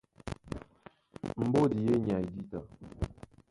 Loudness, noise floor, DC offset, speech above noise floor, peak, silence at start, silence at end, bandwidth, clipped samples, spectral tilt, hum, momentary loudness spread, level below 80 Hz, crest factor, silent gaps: -32 LUFS; -58 dBFS; under 0.1%; 29 dB; -14 dBFS; 0.25 s; 0.4 s; 11.5 kHz; under 0.1%; -8.5 dB/octave; none; 17 LU; -52 dBFS; 18 dB; none